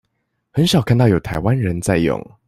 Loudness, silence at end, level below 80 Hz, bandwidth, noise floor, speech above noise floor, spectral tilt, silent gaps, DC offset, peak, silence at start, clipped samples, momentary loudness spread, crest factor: -17 LUFS; 0.25 s; -40 dBFS; 14 kHz; -71 dBFS; 55 dB; -6 dB/octave; none; under 0.1%; -2 dBFS; 0.55 s; under 0.1%; 5 LU; 14 dB